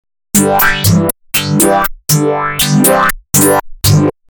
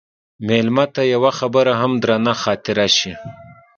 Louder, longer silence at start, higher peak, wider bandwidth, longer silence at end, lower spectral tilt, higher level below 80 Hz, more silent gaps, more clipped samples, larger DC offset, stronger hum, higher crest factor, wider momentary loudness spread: first, -11 LUFS vs -17 LUFS; about the same, 0.35 s vs 0.4 s; about the same, 0 dBFS vs 0 dBFS; first, 19.5 kHz vs 7.4 kHz; about the same, 0.2 s vs 0.25 s; about the same, -4 dB/octave vs -4.5 dB/octave; first, -32 dBFS vs -54 dBFS; neither; neither; neither; neither; second, 12 dB vs 18 dB; second, 5 LU vs 11 LU